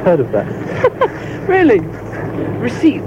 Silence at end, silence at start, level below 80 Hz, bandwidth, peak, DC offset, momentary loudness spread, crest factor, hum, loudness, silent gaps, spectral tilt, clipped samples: 0 s; 0 s; -42 dBFS; 9.2 kHz; 0 dBFS; under 0.1%; 12 LU; 14 dB; none; -16 LUFS; none; -8 dB/octave; under 0.1%